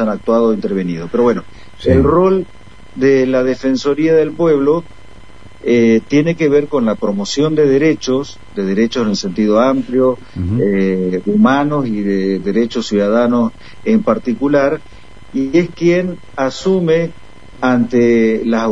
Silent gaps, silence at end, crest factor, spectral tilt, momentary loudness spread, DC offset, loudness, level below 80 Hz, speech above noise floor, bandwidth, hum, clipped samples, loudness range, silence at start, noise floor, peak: none; 0 s; 14 dB; -6.5 dB/octave; 8 LU; 2%; -14 LUFS; -40 dBFS; 25 dB; 8 kHz; none; under 0.1%; 2 LU; 0 s; -39 dBFS; 0 dBFS